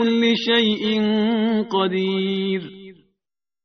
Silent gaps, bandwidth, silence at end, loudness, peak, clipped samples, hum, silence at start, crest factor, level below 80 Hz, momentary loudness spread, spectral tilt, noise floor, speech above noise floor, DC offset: none; 6.4 kHz; 0.7 s; -20 LUFS; -6 dBFS; under 0.1%; none; 0 s; 14 dB; -64 dBFS; 7 LU; -3.5 dB/octave; -86 dBFS; 66 dB; under 0.1%